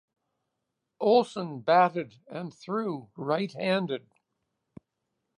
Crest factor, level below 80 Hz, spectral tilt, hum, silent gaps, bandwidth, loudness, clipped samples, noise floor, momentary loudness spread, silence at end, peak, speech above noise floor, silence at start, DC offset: 20 dB; -78 dBFS; -6.5 dB/octave; none; none; 10.5 kHz; -27 LUFS; under 0.1%; -83 dBFS; 16 LU; 1.4 s; -10 dBFS; 56 dB; 1 s; under 0.1%